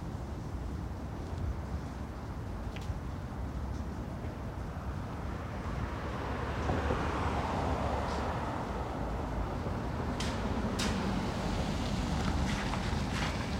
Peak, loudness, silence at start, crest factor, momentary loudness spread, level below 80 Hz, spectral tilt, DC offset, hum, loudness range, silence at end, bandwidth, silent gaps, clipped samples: -20 dBFS; -36 LUFS; 0 s; 16 dB; 8 LU; -40 dBFS; -6 dB/octave; under 0.1%; none; 6 LU; 0 s; 16 kHz; none; under 0.1%